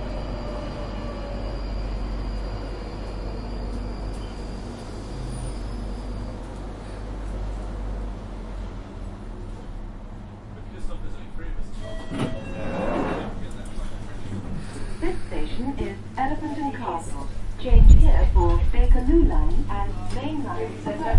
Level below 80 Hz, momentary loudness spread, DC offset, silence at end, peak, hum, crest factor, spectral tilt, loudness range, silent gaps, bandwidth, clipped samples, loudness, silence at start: -24 dBFS; 17 LU; under 0.1%; 0 s; -2 dBFS; none; 20 dB; -7.5 dB/octave; 15 LU; none; 10.5 kHz; under 0.1%; -28 LUFS; 0 s